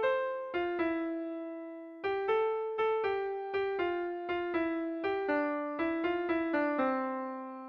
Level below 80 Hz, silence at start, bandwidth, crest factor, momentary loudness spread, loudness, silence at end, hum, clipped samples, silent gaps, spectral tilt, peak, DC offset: -68 dBFS; 0 s; 5.6 kHz; 14 dB; 8 LU; -33 LUFS; 0 s; none; under 0.1%; none; -7 dB/octave; -18 dBFS; under 0.1%